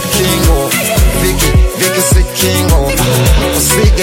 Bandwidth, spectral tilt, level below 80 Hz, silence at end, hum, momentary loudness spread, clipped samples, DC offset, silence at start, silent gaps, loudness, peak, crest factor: 17 kHz; -4 dB/octave; -14 dBFS; 0 s; none; 2 LU; under 0.1%; under 0.1%; 0 s; none; -10 LUFS; 0 dBFS; 10 dB